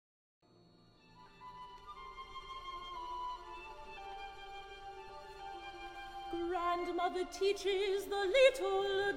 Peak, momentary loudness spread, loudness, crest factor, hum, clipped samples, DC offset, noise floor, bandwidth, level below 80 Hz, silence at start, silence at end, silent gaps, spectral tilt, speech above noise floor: -16 dBFS; 19 LU; -36 LUFS; 22 dB; none; under 0.1%; under 0.1%; -65 dBFS; 16.5 kHz; -60 dBFS; 1.15 s; 0 s; none; -3 dB/octave; 32 dB